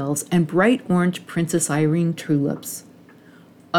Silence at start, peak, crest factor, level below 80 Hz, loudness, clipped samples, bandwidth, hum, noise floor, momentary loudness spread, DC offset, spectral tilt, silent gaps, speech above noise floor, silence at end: 0 s; -6 dBFS; 16 dB; -64 dBFS; -21 LUFS; under 0.1%; 17 kHz; none; -48 dBFS; 9 LU; under 0.1%; -5.5 dB/octave; none; 28 dB; 0 s